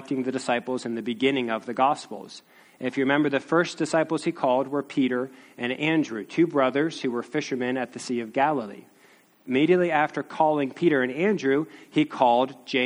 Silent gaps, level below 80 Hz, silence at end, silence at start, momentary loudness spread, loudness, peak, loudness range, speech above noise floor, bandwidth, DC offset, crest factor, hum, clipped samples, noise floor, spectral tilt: none; -72 dBFS; 0 s; 0 s; 9 LU; -25 LUFS; -6 dBFS; 3 LU; 32 dB; 11.5 kHz; under 0.1%; 20 dB; none; under 0.1%; -57 dBFS; -5.5 dB/octave